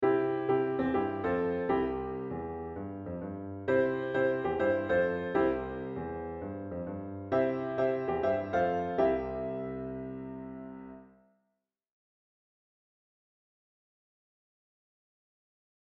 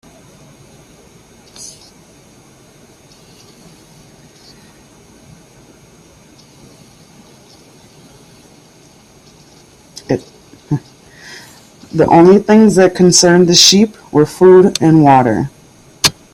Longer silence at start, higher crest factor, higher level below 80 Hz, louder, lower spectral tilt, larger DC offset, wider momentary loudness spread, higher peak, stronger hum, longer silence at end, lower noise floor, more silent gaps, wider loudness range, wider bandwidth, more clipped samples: second, 0 s vs 1.6 s; about the same, 18 dB vs 14 dB; second, -58 dBFS vs -48 dBFS; second, -32 LUFS vs -9 LUFS; first, -9 dB/octave vs -4.5 dB/octave; neither; second, 11 LU vs 26 LU; second, -16 dBFS vs 0 dBFS; neither; first, 4.9 s vs 0.25 s; first, -84 dBFS vs -44 dBFS; neither; second, 12 LU vs 19 LU; second, 5.8 kHz vs 15.5 kHz; neither